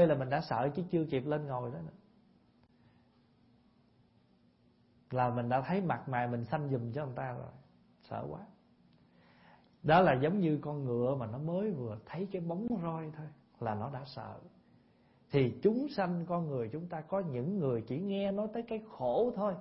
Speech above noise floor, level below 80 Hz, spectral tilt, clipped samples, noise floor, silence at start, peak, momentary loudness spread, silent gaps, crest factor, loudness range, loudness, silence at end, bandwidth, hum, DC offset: 34 dB; -66 dBFS; -6.5 dB/octave; under 0.1%; -68 dBFS; 0 s; -14 dBFS; 13 LU; none; 20 dB; 9 LU; -35 LUFS; 0 s; 5.6 kHz; none; under 0.1%